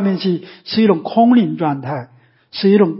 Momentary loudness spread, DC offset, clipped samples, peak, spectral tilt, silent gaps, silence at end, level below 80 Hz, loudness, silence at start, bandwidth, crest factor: 13 LU; under 0.1%; under 0.1%; -2 dBFS; -11.5 dB/octave; none; 0 s; -62 dBFS; -16 LUFS; 0 s; 5.8 kHz; 14 dB